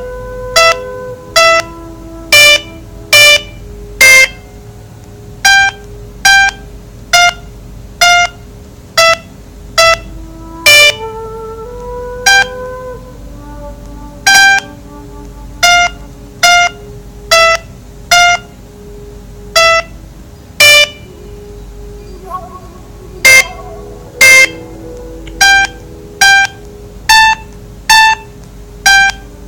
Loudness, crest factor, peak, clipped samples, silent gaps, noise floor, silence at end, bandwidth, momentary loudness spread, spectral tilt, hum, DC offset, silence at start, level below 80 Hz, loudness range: -7 LUFS; 12 dB; 0 dBFS; 2%; none; -32 dBFS; 0 s; over 20 kHz; 25 LU; 0 dB/octave; none; under 0.1%; 0 s; -32 dBFS; 4 LU